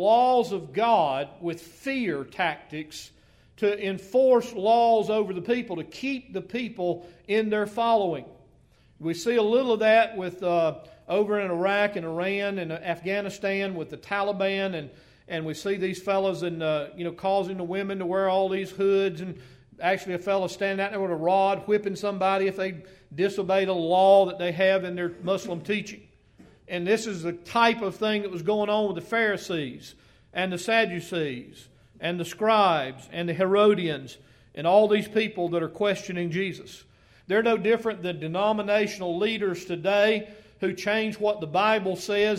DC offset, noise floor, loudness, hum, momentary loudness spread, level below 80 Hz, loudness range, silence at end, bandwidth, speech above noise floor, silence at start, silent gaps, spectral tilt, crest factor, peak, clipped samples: under 0.1%; -59 dBFS; -25 LUFS; none; 12 LU; -64 dBFS; 5 LU; 0 s; 15 kHz; 33 dB; 0 s; none; -5.5 dB/octave; 20 dB; -6 dBFS; under 0.1%